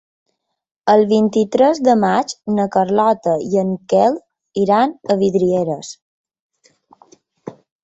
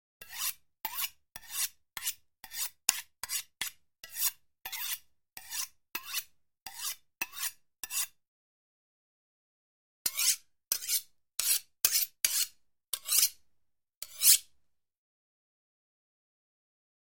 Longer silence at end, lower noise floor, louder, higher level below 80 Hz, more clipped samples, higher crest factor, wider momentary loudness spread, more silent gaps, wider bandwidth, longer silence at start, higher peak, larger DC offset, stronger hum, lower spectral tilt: second, 0.3 s vs 2.6 s; second, -53 dBFS vs -75 dBFS; first, -16 LUFS vs -31 LUFS; first, -60 dBFS vs -74 dBFS; neither; second, 16 dB vs 34 dB; about the same, 14 LU vs 16 LU; second, 6.02-6.24 s, 6.40-6.50 s vs 6.62-6.66 s, 8.28-10.05 s, 13.97-14.01 s; second, 8.2 kHz vs 17 kHz; first, 0.85 s vs 0.2 s; about the same, -2 dBFS vs -2 dBFS; neither; neither; first, -6.5 dB/octave vs 3.5 dB/octave